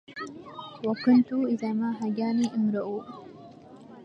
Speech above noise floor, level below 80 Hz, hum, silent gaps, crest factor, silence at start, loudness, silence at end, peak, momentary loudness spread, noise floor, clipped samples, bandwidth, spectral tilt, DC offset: 22 dB; -74 dBFS; none; none; 18 dB; 0.1 s; -27 LUFS; 0 s; -10 dBFS; 20 LU; -48 dBFS; under 0.1%; 7.4 kHz; -7 dB/octave; under 0.1%